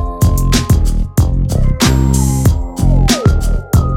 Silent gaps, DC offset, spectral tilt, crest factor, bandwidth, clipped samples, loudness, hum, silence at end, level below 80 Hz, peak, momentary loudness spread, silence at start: none; under 0.1%; -5.5 dB/octave; 10 dB; 17 kHz; under 0.1%; -13 LUFS; none; 0 s; -14 dBFS; 0 dBFS; 4 LU; 0 s